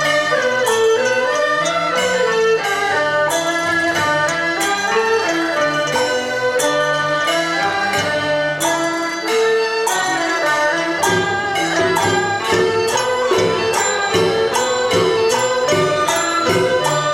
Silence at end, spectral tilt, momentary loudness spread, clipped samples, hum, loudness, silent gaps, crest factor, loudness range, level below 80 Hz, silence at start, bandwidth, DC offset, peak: 0 s; -3 dB/octave; 2 LU; under 0.1%; none; -16 LUFS; none; 14 dB; 1 LU; -54 dBFS; 0 s; 16.5 kHz; 0.1%; -4 dBFS